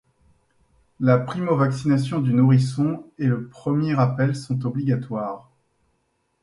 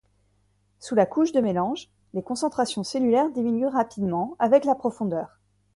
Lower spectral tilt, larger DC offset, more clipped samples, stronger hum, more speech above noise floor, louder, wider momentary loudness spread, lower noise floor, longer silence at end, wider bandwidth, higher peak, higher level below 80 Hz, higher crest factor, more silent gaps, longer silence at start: first, -8.5 dB/octave vs -6 dB/octave; neither; neither; second, none vs 50 Hz at -50 dBFS; first, 49 dB vs 43 dB; about the same, -22 LUFS vs -24 LUFS; second, 8 LU vs 12 LU; first, -70 dBFS vs -66 dBFS; first, 1.05 s vs 0.5 s; about the same, 11 kHz vs 11.5 kHz; about the same, -4 dBFS vs -6 dBFS; about the same, -60 dBFS vs -64 dBFS; about the same, 20 dB vs 18 dB; neither; first, 1 s vs 0.8 s